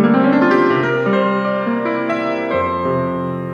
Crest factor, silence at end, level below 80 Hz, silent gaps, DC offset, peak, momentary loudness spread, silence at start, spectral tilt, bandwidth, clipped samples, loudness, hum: 14 dB; 0 s; -58 dBFS; none; under 0.1%; -2 dBFS; 6 LU; 0 s; -8 dB/octave; 7.4 kHz; under 0.1%; -16 LUFS; none